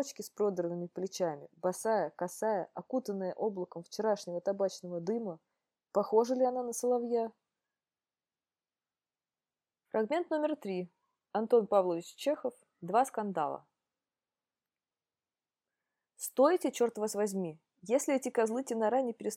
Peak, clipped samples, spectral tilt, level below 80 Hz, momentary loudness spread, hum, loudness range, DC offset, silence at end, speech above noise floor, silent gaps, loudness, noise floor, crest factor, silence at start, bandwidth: -14 dBFS; under 0.1%; -5 dB/octave; -88 dBFS; 10 LU; none; 6 LU; under 0.1%; 0 s; over 57 dB; none; -33 LUFS; under -90 dBFS; 20 dB; 0 s; 16 kHz